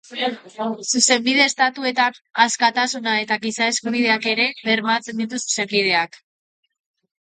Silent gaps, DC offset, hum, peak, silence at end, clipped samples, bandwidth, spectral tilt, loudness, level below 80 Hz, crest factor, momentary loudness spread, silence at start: none; under 0.1%; none; -2 dBFS; 1.05 s; under 0.1%; 9.6 kHz; -1.5 dB/octave; -19 LUFS; -72 dBFS; 20 dB; 10 LU; 0.1 s